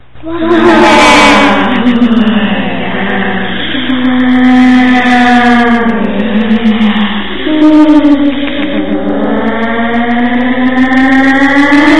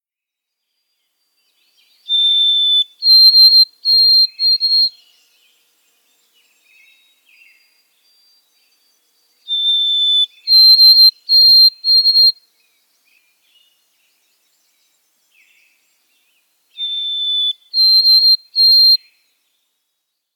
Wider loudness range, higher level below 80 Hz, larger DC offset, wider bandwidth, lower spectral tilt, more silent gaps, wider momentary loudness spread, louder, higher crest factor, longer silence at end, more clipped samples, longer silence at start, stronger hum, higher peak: second, 3 LU vs 14 LU; first, -32 dBFS vs under -90 dBFS; first, 10% vs under 0.1%; second, 11 kHz vs 17.5 kHz; first, -5 dB/octave vs 6 dB/octave; neither; second, 9 LU vs 12 LU; about the same, -7 LUFS vs -8 LUFS; second, 8 dB vs 14 dB; second, 0 s vs 1.4 s; first, 3% vs under 0.1%; second, 0 s vs 2.1 s; neither; about the same, 0 dBFS vs -2 dBFS